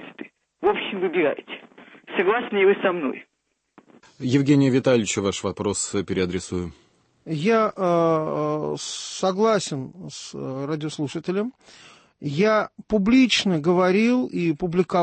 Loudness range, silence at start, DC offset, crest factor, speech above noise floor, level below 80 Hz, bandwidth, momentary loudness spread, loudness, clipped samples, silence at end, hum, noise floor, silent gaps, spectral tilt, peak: 5 LU; 0 s; under 0.1%; 16 dB; 53 dB; -56 dBFS; 8.8 kHz; 14 LU; -22 LUFS; under 0.1%; 0 s; none; -75 dBFS; none; -5 dB/octave; -6 dBFS